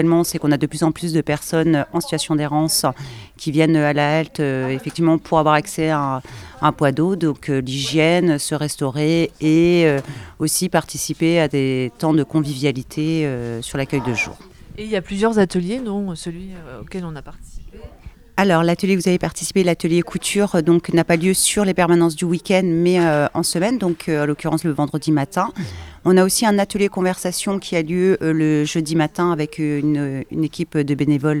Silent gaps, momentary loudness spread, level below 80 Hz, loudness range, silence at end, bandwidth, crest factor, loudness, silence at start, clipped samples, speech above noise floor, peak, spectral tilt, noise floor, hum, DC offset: none; 9 LU; -46 dBFS; 5 LU; 0 s; 16 kHz; 18 dB; -19 LUFS; 0 s; under 0.1%; 23 dB; 0 dBFS; -5 dB/octave; -41 dBFS; none; under 0.1%